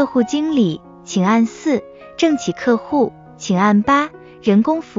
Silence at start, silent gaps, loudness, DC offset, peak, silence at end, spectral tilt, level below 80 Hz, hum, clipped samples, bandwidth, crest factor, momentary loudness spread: 0 s; none; -17 LUFS; under 0.1%; -2 dBFS; 0 s; -6 dB/octave; -54 dBFS; none; under 0.1%; 7.6 kHz; 14 dB; 9 LU